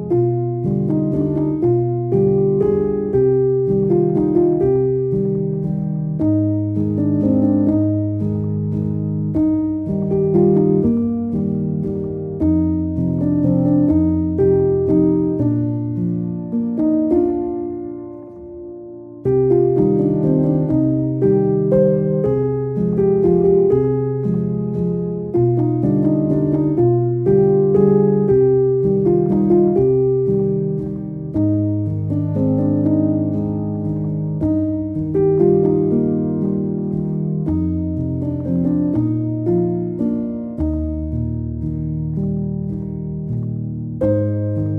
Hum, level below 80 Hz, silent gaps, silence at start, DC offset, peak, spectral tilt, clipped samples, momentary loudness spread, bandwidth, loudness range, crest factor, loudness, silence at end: none; -38 dBFS; none; 0 s; under 0.1%; -2 dBFS; -13.5 dB/octave; under 0.1%; 9 LU; 2.5 kHz; 5 LU; 16 dB; -18 LUFS; 0 s